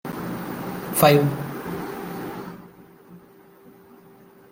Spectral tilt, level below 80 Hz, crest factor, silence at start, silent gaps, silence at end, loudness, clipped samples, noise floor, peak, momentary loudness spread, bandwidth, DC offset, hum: -5.5 dB/octave; -58 dBFS; 24 dB; 0.05 s; none; 0.8 s; -23 LUFS; under 0.1%; -50 dBFS; -2 dBFS; 19 LU; 17 kHz; under 0.1%; none